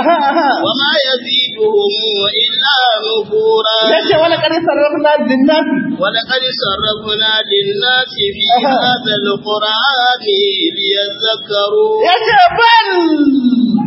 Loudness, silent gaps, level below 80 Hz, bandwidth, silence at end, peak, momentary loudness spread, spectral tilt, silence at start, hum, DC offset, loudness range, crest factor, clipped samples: -11 LUFS; none; -52 dBFS; 5.8 kHz; 0 s; 0 dBFS; 5 LU; -6.5 dB/octave; 0 s; none; under 0.1%; 2 LU; 12 dB; under 0.1%